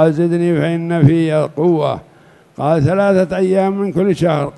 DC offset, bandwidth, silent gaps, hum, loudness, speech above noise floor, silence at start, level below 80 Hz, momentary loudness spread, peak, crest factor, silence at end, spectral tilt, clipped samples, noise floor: under 0.1%; 11.5 kHz; none; none; -15 LUFS; 33 dB; 0 s; -48 dBFS; 4 LU; 0 dBFS; 14 dB; 0.05 s; -8.5 dB/octave; under 0.1%; -46 dBFS